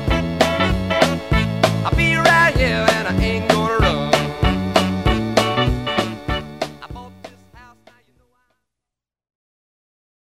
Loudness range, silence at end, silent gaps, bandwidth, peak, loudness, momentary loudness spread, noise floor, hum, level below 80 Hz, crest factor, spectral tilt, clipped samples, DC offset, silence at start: 13 LU; 2.75 s; none; 16 kHz; 0 dBFS; -17 LUFS; 11 LU; -86 dBFS; none; -30 dBFS; 20 dB; -5 dB/octave; under 0.1%; 0.3%; 0 s